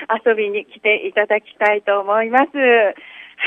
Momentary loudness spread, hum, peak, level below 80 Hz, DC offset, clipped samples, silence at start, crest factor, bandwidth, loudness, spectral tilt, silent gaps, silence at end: 6 LU; none; -2 dBFS; -76 dBFS; under 0.1%; under 0.1%; 0 s; 14 dB; 5 kHz; -17 LUFS; -5 dB/octave; none; 0 s